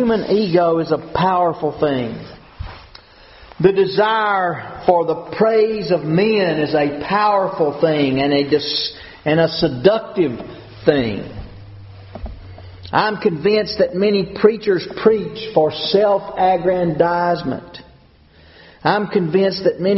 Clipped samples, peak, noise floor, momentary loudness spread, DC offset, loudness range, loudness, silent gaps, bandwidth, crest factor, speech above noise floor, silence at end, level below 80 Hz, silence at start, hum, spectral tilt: under 0.1%; 0 dBFS; -48 dBFS; 18 LU; under 0.1%; 4 LU; -17 LUFS; none; 6 kHz; 18 dB; 32 dB; 0 s; -44 dBFS; 0 s; none; -4 dB/octave